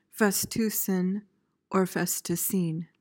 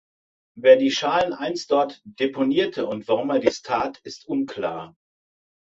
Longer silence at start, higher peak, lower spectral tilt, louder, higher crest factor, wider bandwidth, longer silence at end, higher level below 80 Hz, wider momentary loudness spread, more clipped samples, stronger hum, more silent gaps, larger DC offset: second, 0.15 s vs 0.55 s; second, -12 dBFS vs -2 dBFS; about the same, -4.5 dB/octave vs -4.5 dB/octave; second, -28 LUFS vs -22 LUFS; about the same, 18 dB vs 20 dB; first, 17 kHz vs 7.8 kHz; second, 0.15 s vs 0.9 s; about the same, -66 dBFS vs -64 dBFS; second, 6 LU vs 13 LU; neither; neither; neither; neither